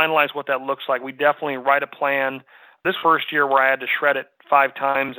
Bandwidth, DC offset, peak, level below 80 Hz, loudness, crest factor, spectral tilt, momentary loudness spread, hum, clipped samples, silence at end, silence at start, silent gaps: 19 kHz; under 0.1%; -2 dBFS; -74 dBFS; -20 LUFS; 18 dB; -7.5 dB/octave; 8 LU; none; under 0.1%; 0 s; 0 s; none